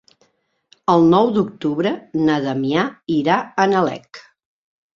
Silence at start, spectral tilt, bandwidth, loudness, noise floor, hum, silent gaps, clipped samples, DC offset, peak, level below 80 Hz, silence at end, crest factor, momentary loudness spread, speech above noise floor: 0.9 s; -7 dB/octave; 7.2 kHz; -18 LUFS; -64 dBFS; none; none; under 0.1%; under 0.1%; -2 dBFS; -60 dBFS; 0.75 s; 18 dB; 8 LU; 46 dB